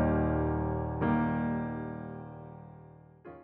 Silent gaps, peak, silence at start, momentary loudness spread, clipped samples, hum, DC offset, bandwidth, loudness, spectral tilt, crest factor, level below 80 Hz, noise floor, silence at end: none; -18 dBFS; 0 s; 22 LU; under 0.1%; none; under 0.1%; 3.8 kHz; -32 LUFS; -9 dB/octave; 14 dB; -44 dBFS; -53 dBFS; 0 s